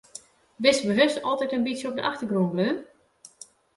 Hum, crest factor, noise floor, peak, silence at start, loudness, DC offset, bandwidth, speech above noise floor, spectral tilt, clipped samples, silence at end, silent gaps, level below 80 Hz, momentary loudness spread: none; 20 dB; -51 dBFS; -6 dBFS; 0.15 s; -25 LUFS; under 0.1%; 11.5 kHz; 27 dB; -4.5 dB/octave; under 0.1%; 0.95 s; none; -68 dBFS; 23 LU